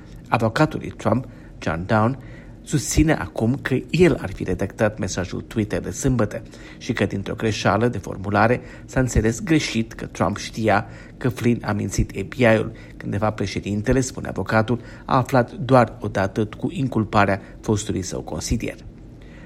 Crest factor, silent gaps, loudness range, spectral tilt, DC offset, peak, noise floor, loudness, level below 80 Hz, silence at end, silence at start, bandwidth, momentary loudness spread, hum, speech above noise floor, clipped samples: 22 dB; none; 2 LU; -6 dB/octave; under 0.1%; 0 dBFS; -41 dBFS; -22 LUFS; -38 dBFS; 0 s; 0 s; 15.5 kHz; 10 LU; none; 19 dB; under 0.1%